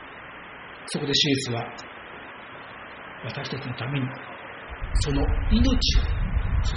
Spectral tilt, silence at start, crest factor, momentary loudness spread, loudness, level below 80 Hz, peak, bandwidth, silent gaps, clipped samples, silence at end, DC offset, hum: -4 dB/octave; 0 s; 18 dB; 19 LU; -26 LUFS; -30 dBFS; -8 dBFS; 7.6 kHz; none; under 0.1%; 0 s; under 0.1%; none